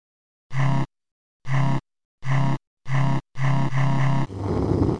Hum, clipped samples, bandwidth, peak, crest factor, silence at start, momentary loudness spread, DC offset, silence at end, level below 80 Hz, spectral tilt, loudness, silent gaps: none; under 0.1%; 9.6 kHz; -6 dBFS; 18 dB; 0.5 s; 10 LU; 5%; 0 s; -42 dBFS; -8 dB/octave; -25 LUFS; 1.12-1.40 s, 2.05-2.18 s, 2.67-2.77 s